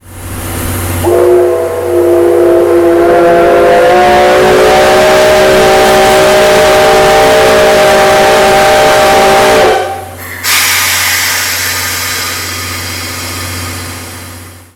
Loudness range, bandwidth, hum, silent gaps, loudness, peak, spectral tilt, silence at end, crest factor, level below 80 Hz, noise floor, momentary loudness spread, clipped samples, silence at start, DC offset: 5 LU; 19 kHz; none; none; -6 LUFS; 0 dBFS; -3.5 dB/octave; 0.2 s; 8 dB; -32 dBFS; -28 dBFS; 12 LU; 0.3%; 0.05 s; under 0.1%